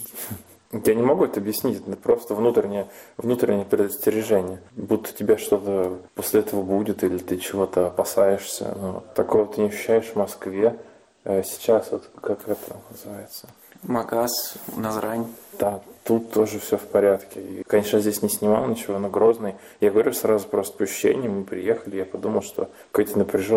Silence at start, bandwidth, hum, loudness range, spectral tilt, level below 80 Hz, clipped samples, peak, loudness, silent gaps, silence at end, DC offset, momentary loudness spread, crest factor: 0 s; 16.5 kHz; none; 5 LU; -5 dB/octave; -60 dBFS; under 0.1%; -8 dBFS; -23 LUFS; none; 0 s; under 0.1%; 12 LU; 16 dB